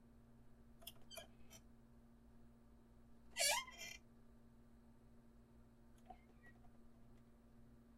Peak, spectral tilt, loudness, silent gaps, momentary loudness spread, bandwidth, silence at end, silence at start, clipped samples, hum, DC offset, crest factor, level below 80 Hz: -24 dBFS; -0.5 dB/octave; -44 LUFS; none; 27 LU; 15.5 kHz; 0 s; 0 s; under 0.1%; none; under 0.1%; 30 dB; -70 dBFS